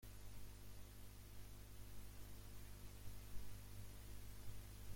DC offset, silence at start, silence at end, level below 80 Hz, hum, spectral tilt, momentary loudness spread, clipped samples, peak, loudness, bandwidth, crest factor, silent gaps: under 0.1%; 0 s; 0 s; -60 dBFS; 50 Hz at -60 dBFS; -4.5 dB/octave; 2 LU; under 0.1%; -36 dBFS; -59 LUFS; 16.5 kHz; 16 dB; none